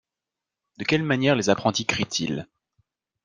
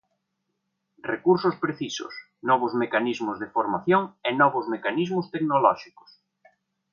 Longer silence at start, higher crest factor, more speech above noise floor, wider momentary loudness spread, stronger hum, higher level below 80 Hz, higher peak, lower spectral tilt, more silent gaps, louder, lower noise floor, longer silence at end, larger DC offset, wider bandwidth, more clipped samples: second, 0.8 s vs 1.05 s; about the same, 22 dB vs 20 dB; first, 64 dB vs 54 dB; about the same, 9 LU vs 11 LU; neither; first, -60 dBFS vs -72 dBFS; about the same, -4 dBFS vs -6 dBFS; second, -4.5 dB/octave vs -6 dB/octave; neither; about the same, -24 LUFS vs -25 LUFS; first, -87 dBFS vs -78 dBFS; second, 0.8 s vs 1.1 s; neither; first, 10.5 kHz vs 7.2 kHz; neither